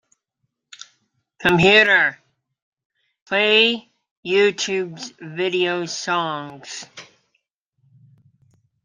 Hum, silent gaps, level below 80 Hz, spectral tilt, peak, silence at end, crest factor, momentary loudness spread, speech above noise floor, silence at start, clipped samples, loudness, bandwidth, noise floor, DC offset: none; 2.62-2.72 s, 2.85-2.90 s, 3.22-3.26 s, 4.11-4.23 s; -58 dBFS; -3.5 dB/octave; 0 dBFS; 1.8 s; 22 dB; 21 LU; 57 dB; 1.4 s; under 0.1%; -18 LUFS; 13.5 kHz; -76 dBFS; under 0.1%